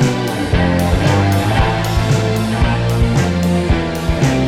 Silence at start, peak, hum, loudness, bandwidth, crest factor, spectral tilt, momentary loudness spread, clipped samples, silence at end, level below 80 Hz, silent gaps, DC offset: 0 s; -4 dBFS; none; -15 LUFS; 16 kHz; 10 dB; -6 dB/octave; 3 LU; under 0.1%; 0 s; -24 dBFS; none; under 0.1%